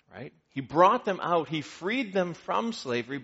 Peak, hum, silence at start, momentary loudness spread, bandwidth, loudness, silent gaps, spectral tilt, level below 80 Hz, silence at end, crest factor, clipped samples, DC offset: -6 dBFS; none; 0.15 s; 17 LU; 8 kHz; -27 LUFS; none; -3.5 dB/octave; -70 dBFS; 0 s; 22 dB; under 0.1%; under 0.1%